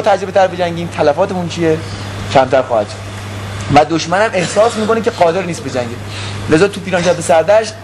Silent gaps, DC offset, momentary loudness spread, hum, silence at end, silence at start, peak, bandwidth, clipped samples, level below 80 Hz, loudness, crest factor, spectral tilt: none; 0.2%; 12 LU; none; 0 s; 0 s; 0 dBFS; 13 kHz; under 0.1%; -40 dBFS; -14 LUFS; 14 dB; -5 dB/octave